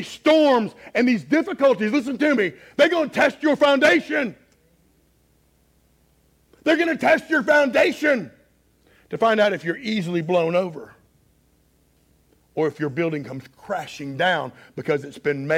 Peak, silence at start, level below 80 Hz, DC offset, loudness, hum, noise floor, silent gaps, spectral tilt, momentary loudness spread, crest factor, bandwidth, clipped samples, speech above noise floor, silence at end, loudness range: -6 dBFS; 0 s; -64 dBFS; under 0.1%; -20 LUFS; none; -61 dBFS; none; -5.5 dB/octave; 13 LU; 16 dB; 15.5 kHz; under 0.1%; 41 dB; 0 s; 7 LU